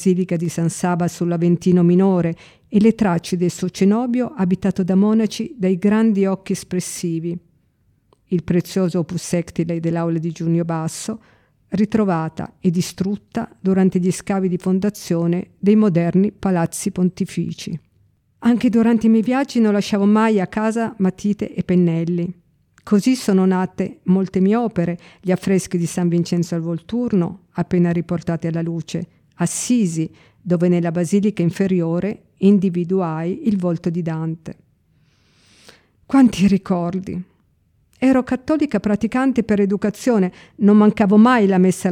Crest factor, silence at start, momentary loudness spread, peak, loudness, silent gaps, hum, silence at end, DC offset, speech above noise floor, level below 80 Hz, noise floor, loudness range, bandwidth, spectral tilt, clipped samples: 16 dB; 0 s; 10 LU; -2 dBFS; -19 LUFS; none; none; 0 s; under 0.1%; 43 dB; -52 dBFS; -61 dBFS; 4 LU; 15 kHz; -7 dB/octave; under 0.1%